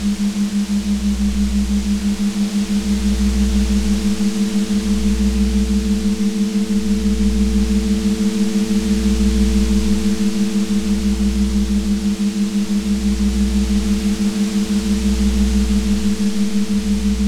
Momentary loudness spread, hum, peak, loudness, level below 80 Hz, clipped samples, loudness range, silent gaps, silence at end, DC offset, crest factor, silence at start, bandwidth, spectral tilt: 2 LU; none; -4 dBFS; -18 LUFS; -24 dBFS; under 0.1%; 1 LU; none; 0 s; under 0.1%; 12 dB; 0 s; 14.5 kHz; -6 dB/octave